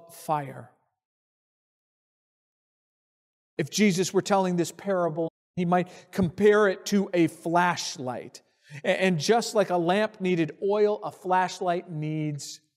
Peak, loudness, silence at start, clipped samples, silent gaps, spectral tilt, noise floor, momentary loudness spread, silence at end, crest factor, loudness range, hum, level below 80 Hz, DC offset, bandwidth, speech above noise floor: -10 dBFS; -26 LUFS; 0.1 s; under 0.1%; 1.05-3.57 s, 5.30-5.54 s; -5 dB/octave; under -90 dBFS; 11 LU; 0.2 s; 18 dB; 6 LU; none; -66 dBFS; under 0.1%; 15.5 kHz; over 65 dB